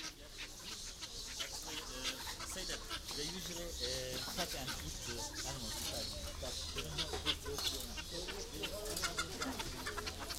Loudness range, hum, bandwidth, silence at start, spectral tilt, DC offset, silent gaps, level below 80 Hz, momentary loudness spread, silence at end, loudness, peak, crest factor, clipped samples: 2 LU; none; 16 kHz; 0 s; -2 dB/octave; under 0.1%; none; -52 dBFS; 6 LU; 0 s; -41 LUFS; -22 dBFS; 22 dB; under 0.1%